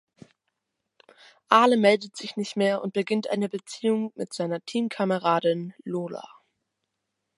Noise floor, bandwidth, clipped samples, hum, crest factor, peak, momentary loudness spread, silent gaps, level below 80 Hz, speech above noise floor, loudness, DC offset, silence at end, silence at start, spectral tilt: -82 dBFS; 11.5 kHz; under 0.1%; none; 24 dB; -2 dBFS; 13 LU; none; -80 dBFS; 57 dB; -25 LUFS; under 0.1%; 1.1 s; 1.5 s; -5.5 dB/octave